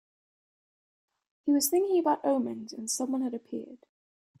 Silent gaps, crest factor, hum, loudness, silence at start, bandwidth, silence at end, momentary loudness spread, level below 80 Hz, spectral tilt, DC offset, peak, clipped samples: none; 18 dB; none; -29 LUFS; 1.45 s; 16 kHz; 0.65 s; 14 LU; -80 dBFS; -3 dB/octave; under 0.1%; -14 dBFS; under 0.1%